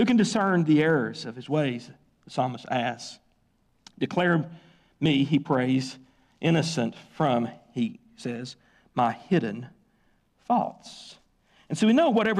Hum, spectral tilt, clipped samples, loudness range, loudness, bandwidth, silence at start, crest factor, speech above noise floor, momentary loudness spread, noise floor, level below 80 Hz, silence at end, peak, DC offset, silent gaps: none; -6 dB/octave; under 0.1%; 4 LU; -26 LUFS; 11 kHz; 0 s; 14 dB; 42 dB; 17 LU; -67 dBFS; -66 dBFS; 0 s; -12 dBFS; under 0.1%; none